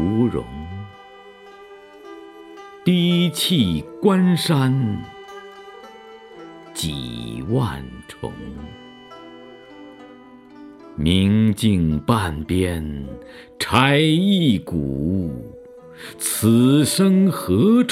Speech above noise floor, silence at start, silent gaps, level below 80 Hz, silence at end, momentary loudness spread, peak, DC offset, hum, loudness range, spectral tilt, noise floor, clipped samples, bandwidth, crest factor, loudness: 25 dB; 0 s; none; -42 dBFS; 0 s; 24 LU; 0 dBFS; under 0.1%; none; 10 LU; -5.5 dB/octave; -44 dBFS; under 0.1%; 16 kHz; 20 dB; -19 LUFS